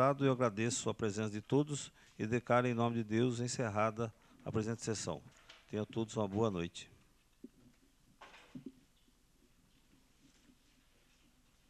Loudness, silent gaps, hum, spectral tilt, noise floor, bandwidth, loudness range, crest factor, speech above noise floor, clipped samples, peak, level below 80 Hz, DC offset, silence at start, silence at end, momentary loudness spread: -37 LUFS; none; none; -5.5 dB/octave; -70 dBFS; 13 kHz; 8 LU; 22 dB; 34 dB; under 0.1%; -16 dBFS; -70 dBFS; under 0.1%; 0 s; 3 s; 20 LU